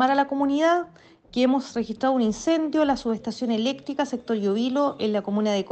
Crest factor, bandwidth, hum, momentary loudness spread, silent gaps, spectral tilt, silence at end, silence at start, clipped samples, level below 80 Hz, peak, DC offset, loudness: 14 dB; 8.6 kHz; none; 6 LU; none; -5 dB/octave; 0 s; 0 s; under 0.1%; -58 dBFS; -8 dBFS; under 0.1%; -24 LUFS